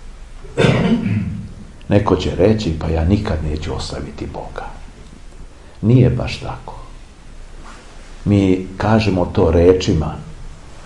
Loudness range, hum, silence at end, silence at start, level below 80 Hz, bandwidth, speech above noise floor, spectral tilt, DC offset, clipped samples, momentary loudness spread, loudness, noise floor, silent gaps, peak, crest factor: 4 LU; none; 0 s; 0 s; -32 dBFS; 11 kHz; 20 dB; -7.5 dB/octave; 0.2%; under 0.1%; 22 LU; -17 LUFS; -36 dBFS; none; 0 dBFS; 18 dB